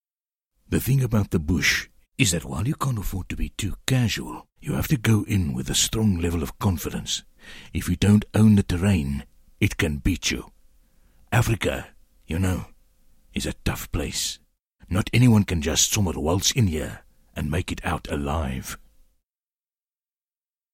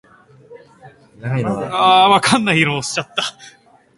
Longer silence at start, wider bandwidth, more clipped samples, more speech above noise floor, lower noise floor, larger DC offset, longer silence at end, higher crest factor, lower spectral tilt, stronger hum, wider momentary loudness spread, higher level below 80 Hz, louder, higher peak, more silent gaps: first, 0.7 s vs 0.5 s; first, 16.5 kHz vs 11.5 kHz; neither; first, over 67 dB vs 29 dB; first, under -90 dBFS vs -45 dBFS; neither; first, 2 s vs 0.5 s; about the same, 22 dB vs 18 dB; about the same, -4.5 dB/octave vs -4 dB/octave; neither; about the same, 13 LU vs 12 LU; first, -38 dBFS vs -56 dBFS; second, -24 LUFS vs -15 LUFS; about the same, -2 dBFS vs 0 dBFS; neither